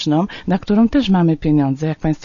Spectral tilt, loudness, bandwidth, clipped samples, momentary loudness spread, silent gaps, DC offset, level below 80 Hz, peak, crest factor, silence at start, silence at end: -7.5 dB/octave; -16 LUFS; 7.2 kHz; under 0.1%; 6 LU; none; under 0.1%; -38 dBFS; -4 dBFS; 12 dB; 0 s; 0 s